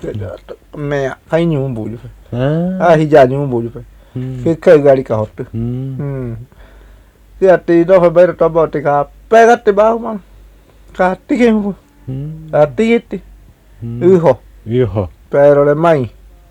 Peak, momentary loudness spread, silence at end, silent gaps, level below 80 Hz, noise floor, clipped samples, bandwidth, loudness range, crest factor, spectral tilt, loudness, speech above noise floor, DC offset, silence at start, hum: 0 dBFS; 18 LU; 0.4 s; none; -40 dBFS; -42 dBFS; 0.4%; 10.5 kHz; 5 LU; 14 dB; -8 dB/octave; -12 LUFS; 30 dB; under 0.1%; 0.05 s; none